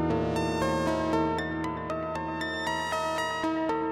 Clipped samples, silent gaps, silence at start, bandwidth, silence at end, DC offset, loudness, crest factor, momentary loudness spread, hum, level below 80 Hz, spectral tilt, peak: under 0.1%; none; 0 s; 15.5 kHz; 0 s; under 0.1%; -29 LUFS; 14 dB; 5 LU; none; -52 dBFS; -5.5 dB/octave; -16 dBFS